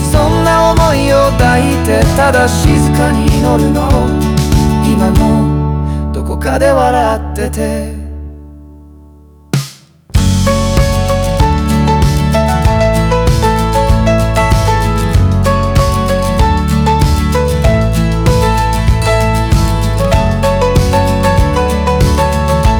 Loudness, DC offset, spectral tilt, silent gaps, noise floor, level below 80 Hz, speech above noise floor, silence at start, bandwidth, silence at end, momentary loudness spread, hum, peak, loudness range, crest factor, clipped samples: -11 LUFS; under 0.1%; -6 dB/octave; none; -38 dBFS; -16 dBFS; 29 dB; 0 s; over 20 kHz; 0 s; 7 LU; none; 0 dBFS; 5 LU; 10 dB; under 0.1%